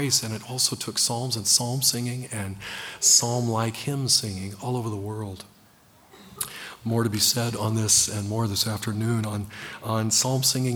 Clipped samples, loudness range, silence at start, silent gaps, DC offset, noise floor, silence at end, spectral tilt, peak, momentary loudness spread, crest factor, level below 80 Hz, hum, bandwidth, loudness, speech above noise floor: under 0.1%; 6 LU; 0 s; none; under 0.1%; -56 dBFS; 0 s; -3 dB/octave; -4 dBFS; 14 LU; 22 dB; -60 dBFS; none; over 20 kHz; -23 LUFS; 31 dB